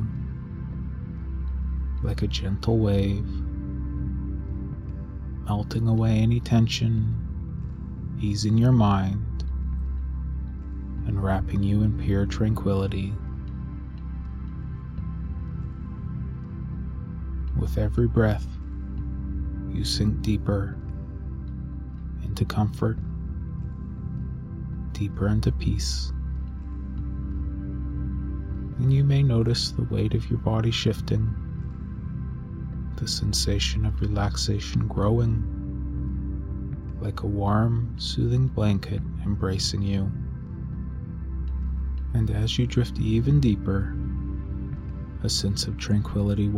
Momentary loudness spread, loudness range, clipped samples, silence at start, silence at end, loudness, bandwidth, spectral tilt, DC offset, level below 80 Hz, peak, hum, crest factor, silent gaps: 13 LU; 6 LU; under 0.1%; 0 s; 0 s; -27 LUFS; 13.5 kHz; -6.5 dB/octave; under 0.1%; -32 dBFS; -8 dBFS; none; 18 dB; none